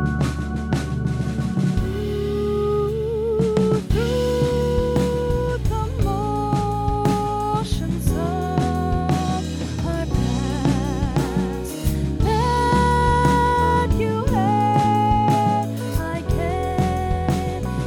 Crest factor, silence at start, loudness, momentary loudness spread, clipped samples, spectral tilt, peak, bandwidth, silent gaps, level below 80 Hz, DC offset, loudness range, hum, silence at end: 14 dB; 0 s; -21 LUFS; 7 LU; under 0.1%; -7 dB/octave; -6 dBFS; 18.5 kHz; none; -30 dBFS; under 0.1%; 4 LU; none; 0 s